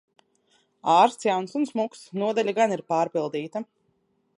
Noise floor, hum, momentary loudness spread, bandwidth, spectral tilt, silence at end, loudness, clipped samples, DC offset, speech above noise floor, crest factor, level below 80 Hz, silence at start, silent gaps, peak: -70 dBFS; none; 13 LU; 11.5 kHz; -5 dB/octave; 0.75 s; -25 LUFS; under 0.1%; under 0.1%; 46 dB; 20 dB; -82 dBFS; 0.85 s; none; -6 dBFS